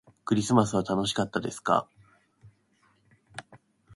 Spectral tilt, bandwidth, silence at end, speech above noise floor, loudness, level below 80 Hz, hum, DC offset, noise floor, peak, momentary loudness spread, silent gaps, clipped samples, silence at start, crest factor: -5 dB/octave; 11.5 kHz; 0.4 s; 41 dB; -27 LUFS; -62 dBFS; none; under 0.1%; -67 dBFS; -8 dBFS; 21 LU; none; under 0.1%; 0.25 s; 22 dB